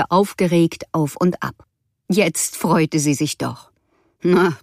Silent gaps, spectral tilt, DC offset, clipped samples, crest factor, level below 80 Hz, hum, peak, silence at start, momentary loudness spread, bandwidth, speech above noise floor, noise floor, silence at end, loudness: none; -5 dB/octave; under 0.1%; under 0.1%; 16 dB; -58 dBFS; none; -2 dBFS; 0 s; 10 LU; 15.5 kHz; 45 dB; -63 dBFS; 0.05 s; -19 LUFS